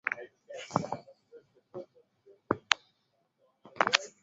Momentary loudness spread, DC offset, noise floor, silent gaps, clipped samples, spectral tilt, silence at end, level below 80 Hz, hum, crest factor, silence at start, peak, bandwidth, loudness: 20 LU; under 0.1%; -76 dBFS; none; under 0.1%; -1 dB/octave; 0.15 s; -72 dBFS; none; 36 dB; 0.05 s; 0 dBFS; 7.6 kHz; -32 LUFS